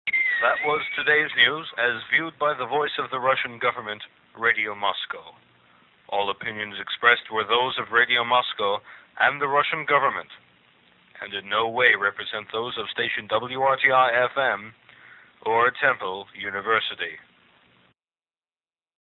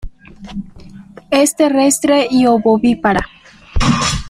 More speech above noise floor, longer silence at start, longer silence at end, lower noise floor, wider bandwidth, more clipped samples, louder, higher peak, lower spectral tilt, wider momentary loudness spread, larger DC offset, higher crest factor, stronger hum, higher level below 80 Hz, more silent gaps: first, over 66 dB vs 24 dB; about the same, 0.05 s vs 0.05 s; first, 1.85 s vs 0 s; first, under -90 dBFS vs -36 dBFS; second, 6.4 kHz vs 15.5 kHz; neither; second, -23 LUFS vs -13 LUFS; about the same, -2 dBFS vs 0 dBFS; about the same, -5.5 dB/octave vs -4.5 dB/octave; second, 13 LU vs 17 LU; neither; first, 22 dB vs 14 dB; neither; second, -70 dBFS vs -30 dBFS; neither